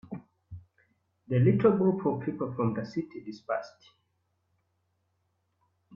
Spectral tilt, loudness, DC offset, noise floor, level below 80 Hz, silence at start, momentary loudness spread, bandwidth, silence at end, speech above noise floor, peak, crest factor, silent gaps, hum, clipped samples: -10 dB/octave; -28 LUFS; under 0.1%; -76 dBFS; -66 dBFS; 0.1 s; 26 LU; 6.8 kHz; 2.25 s; 49 dB; -12 dBFS; 20 dB; none; none; under 0.1%